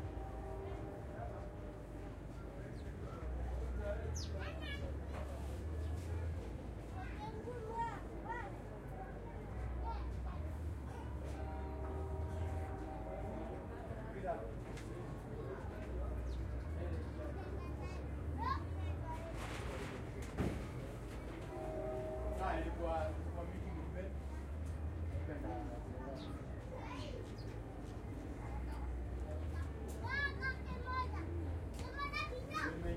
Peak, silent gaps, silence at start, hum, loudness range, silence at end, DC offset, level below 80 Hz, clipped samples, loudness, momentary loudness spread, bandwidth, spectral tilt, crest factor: -26 dBFS; none; 0 s; none; 4 LU; 0 s; under 0.1%; -48 dBFS; under 0.1%; -45 LUFS; 7 LU; 14 kHz; -6.5 dB/octave; 18 dB